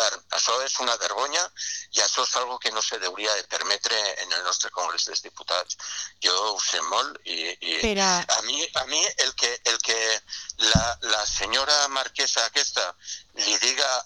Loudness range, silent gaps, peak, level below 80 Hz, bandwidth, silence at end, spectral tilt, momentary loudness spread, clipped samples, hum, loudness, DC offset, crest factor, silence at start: 3 LU; none; -4 dBFS; -48 dBFS; 14 kHz; 0 s; -1 dB/octave; 7 LU; under 0.1%; none; -23 LUFS; under 0.1%; 22 dB; 0 s